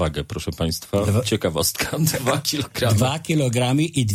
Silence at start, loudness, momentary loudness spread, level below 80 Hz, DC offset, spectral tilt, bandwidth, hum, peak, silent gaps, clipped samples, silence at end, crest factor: 0 s; -21 LUFS; 5 LU; -42 dBFS; under 0.1%; -4.5 dB/octave; 16.5 kHz; none; -6 dBFS; none; under 0.1%; 0 s; 16 dB